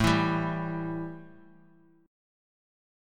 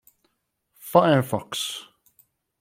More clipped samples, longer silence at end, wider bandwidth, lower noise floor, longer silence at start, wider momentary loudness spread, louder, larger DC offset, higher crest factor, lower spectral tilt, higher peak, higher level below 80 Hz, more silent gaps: neither; first, 1.75 s vs 0.8 s; about the same, 16 kHz vs 16.5 kHz; second, -60 dBFS vs -74 dBFS; second, 0 s vs 0.85 s; second, 15 LU vs 18 LU; second, -30 LUFS vs -22 LUFS; neither; about the same, 22 dB vs 22 dB; about the same, -6 dB/octave vs -5 dB/octave; second, -10 dBFS vs -2 dBFS; first, -50 dBFS vs -66 dBFS; neither